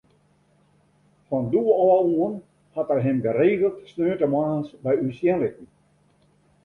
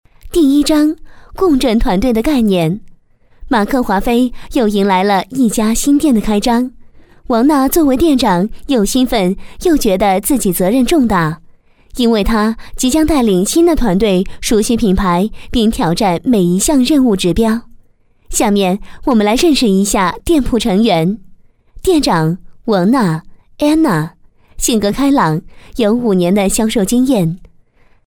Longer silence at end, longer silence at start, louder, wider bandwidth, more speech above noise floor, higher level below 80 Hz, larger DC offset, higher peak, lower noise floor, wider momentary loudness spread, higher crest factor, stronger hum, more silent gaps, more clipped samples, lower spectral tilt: first, 1 s vs 0.65 s; first, 1.3 s vs 0.25 s; second, -23 LUFS vs -13 LUFS; second, 4.3 kHz vs 19 kHz; about the same, 40 dB vs 37 dB; second, -62 dBFS vs -28 dBFS; neither; second, -6 dBFS vs 0 dBFS; first, -62 dBFS vs -49 dBFS; first, 10 LU vs 7 LU; about the same, 16 dB vs 12 dB; neither; neither; neither; first, -10 dB/octave vs -5 dB/octave